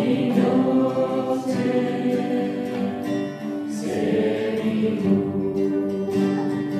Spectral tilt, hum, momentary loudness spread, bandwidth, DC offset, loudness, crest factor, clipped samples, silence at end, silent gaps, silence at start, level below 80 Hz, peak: -7.5 dB/octave; none; 7 LU; 13.5 kHz; under 0.1%; -23 LUFS; 14 dB; under 0.1%; 0 s; none; 0 s; -62 dBFS; -8 dBFS